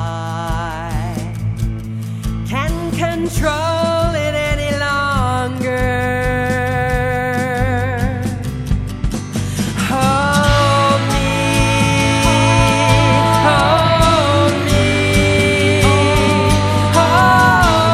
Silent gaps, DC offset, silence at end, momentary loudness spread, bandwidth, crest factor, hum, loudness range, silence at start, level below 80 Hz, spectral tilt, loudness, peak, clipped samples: none; under 0.1%; 0 s; 10 LU; 15 kHz; 14 dB; none; 7 LU; 0 s; -26 dBFS; -5 dB/octave; -15 LUFS; 0 dBFS; under 0.1%